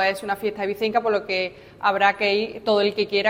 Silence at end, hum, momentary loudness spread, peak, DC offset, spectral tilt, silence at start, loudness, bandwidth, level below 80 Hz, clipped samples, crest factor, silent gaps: 0 s; none; 7 LU; -4 dBFS; under 0.1%; -4.5 dB/octave; 0 s; -22 LUFS; 16.5 kHz; -60 dBFS; under 0.1%; 18 dB; none